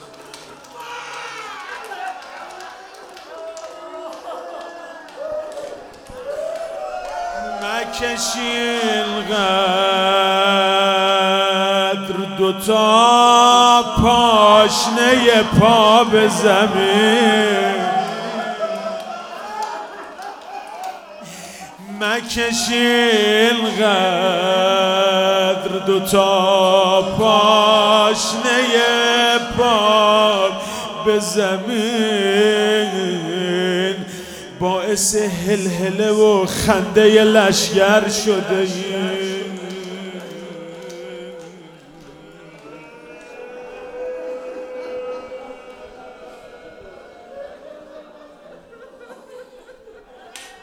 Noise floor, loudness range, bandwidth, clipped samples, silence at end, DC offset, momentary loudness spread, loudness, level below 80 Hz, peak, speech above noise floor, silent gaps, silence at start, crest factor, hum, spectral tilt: -43 dBFS; 20 LU; 18.5 kHz; under 0.1%; 0.1 s; under 0.1%; 22 LU; -15 LUFS; -46 dBFS; 0 dBFS; 29 dB; none; 0 s; 18 dB; none; -3.5 dB/octave